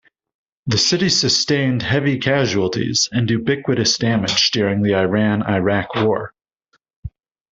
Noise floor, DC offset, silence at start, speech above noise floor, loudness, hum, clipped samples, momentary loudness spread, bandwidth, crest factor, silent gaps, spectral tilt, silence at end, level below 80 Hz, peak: -65 dBFS; under 0.1%; 0.65 s; 48 dB; -17 LUFS; none; under 0.1%; 8 LU; 8 kHz; 16 dB; 6.96-7.03 s; -4 dB/octave; 0.45 s; -50 dBFS; -2 dBFS